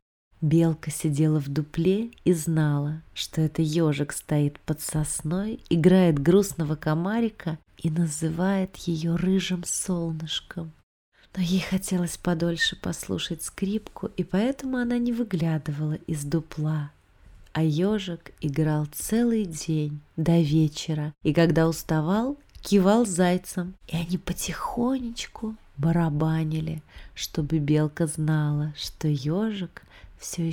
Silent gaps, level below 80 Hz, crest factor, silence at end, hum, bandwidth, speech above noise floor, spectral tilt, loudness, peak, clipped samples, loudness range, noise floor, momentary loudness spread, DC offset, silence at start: 10.83-11.12 s; -48 dBFS; 18 dB; 0 s; none; 18 kHz; 26 dB; -6 dB/octave; -26 LUFS; -6 dBFS; under 0.1%; 4 LU; -51 dBFS; 11 LU; under 0.1%; 0.4 s